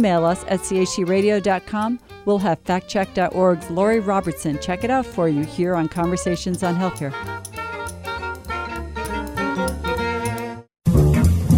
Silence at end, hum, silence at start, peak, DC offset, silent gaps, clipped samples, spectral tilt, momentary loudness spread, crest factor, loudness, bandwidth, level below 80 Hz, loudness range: 0 s; none; 0 s; -4 dBFS; under 0.1%; none; under 0.1%; -6 dB/octave; 11 LU; 16 dB; -22 LUFS; 17 kHz; -36 dBFS; 6 LU